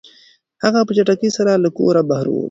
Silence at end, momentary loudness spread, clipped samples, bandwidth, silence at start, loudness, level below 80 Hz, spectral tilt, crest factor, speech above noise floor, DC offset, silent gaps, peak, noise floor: 0 s; 4 LU; under 0.1%; 7.8 kHz; 0.6 s; -16 LUFS; -60 dBFS; -6 dB/octave; 16 dB; 36 dB; under 0.1%; none; 0 dBFS; -51 dBFS